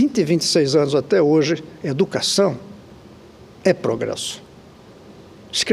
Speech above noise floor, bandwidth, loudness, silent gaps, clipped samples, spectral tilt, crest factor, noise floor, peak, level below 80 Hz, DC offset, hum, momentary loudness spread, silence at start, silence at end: 26 dB; 14.5 kHz; -19 LUFS; none; under 0.1%; -4.5 dB/octave; 18 dB; -44 dBFS; -2 dBFS; -58 dBFS; under 0.1%; none; 11 LU; 0 s; 0 s